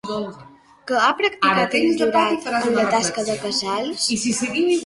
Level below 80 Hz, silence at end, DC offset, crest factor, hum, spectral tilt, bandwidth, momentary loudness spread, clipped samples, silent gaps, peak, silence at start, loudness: -60 dBFS; 0 s; under 0.1%; 18 dB; none; -3 dB/octave; 11.5 kHz; 7 LU; under 0.1%; none; -4 dBFS; 0.05 s; -20 LUFS